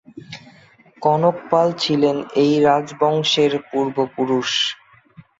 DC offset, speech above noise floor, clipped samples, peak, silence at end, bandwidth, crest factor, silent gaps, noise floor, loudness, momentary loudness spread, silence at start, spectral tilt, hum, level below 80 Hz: under 0.1%; 32 dB; under 0.1%; -2 dBFS; 0.65 s; 7.8 kHz; 16 dB; none; -50 dBFS; -18 LUFS; 15 LU; 0.15 s; -5 dB/octave; none; -62 dBFS